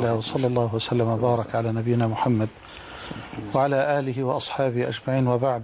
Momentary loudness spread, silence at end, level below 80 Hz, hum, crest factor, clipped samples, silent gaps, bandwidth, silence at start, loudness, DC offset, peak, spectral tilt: 13 LU; 0 s; -54 dBFS; none; 14 dB; under 0.1%; none; 4 kHz; 0 s; -24 LUFS; under 0.1%; -10 dBFS; -11.5 dB/octave